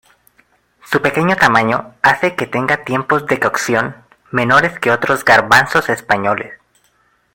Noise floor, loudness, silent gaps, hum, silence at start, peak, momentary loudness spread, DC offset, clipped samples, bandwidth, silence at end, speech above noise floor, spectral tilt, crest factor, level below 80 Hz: -58 dBFS; -14 LUFS; none; none; 0.9 s; 0 dBFS; 8 LU; under 0.1%; under 0.1%; 17 kHz; 0.8 s; 44 dB; -4.5 dB/octave; 16 dB; -50 dBFS